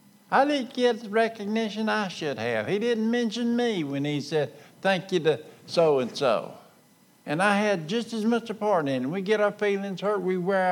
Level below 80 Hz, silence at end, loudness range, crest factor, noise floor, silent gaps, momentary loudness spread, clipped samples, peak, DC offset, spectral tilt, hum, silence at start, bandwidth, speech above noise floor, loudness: -84 dBFS; 0 s; 1 LU; 18 dB; -59 dBFS; none; 6 LU; under 0.1%; -8 dBFS; under 0.1%; -5.5 dB/octave; none; 0.3 s; 16.5 kHz; 33 dB; -26 LUFS